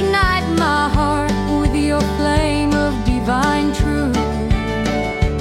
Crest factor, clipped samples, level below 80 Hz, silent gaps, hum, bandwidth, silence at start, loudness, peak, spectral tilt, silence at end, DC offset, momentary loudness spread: 14 dB; under 0.1%; -24 dBFS; none; none; 15.5 kHz; 0 s; -17 LUFS; -2 dBFS; -6 dB/octave; 0 s; under 0.1%; 3 LU